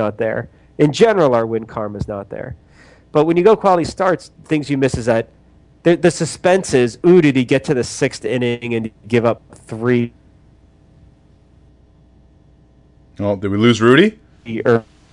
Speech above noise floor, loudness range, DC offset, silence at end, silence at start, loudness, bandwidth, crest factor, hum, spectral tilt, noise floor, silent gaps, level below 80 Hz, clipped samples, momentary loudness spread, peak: 34 dB; 9 LU; under 0.1%; 0.3 s; 0 s; -16 LUFS; 11 kHz; 18 dB; none; -6 dB/octave; -49 dBFS; none; -48 dBFS; under 0.1%; 14 LU; 0 dBFS